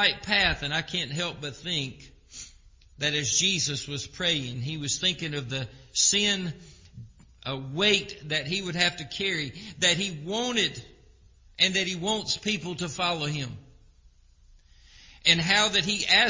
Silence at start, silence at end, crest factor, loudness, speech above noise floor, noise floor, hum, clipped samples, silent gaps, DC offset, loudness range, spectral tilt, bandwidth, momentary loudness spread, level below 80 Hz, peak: 0 s; 0 s; 24 dB; -26 LUFS; 30 dB; -57 dBFS; none; under 0.1%; none; under 0.1%; 3 LU; -2 dB/octave; 7.8 kHz; 14 LU; -52 dBFS; -4 dBFS